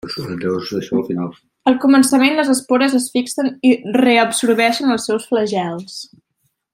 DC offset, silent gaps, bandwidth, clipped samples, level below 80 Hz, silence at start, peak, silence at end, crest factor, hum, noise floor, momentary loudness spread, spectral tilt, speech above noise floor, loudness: under 0.1%; none; 15.5 kHz; under 0.1%; -60 dBFS; 0.05 s; -2 dBFS; 0.7 s; 16 dB; none; -69 dBFS; 12 LU; -4 dB/octave; 53 dB; -16 LUFS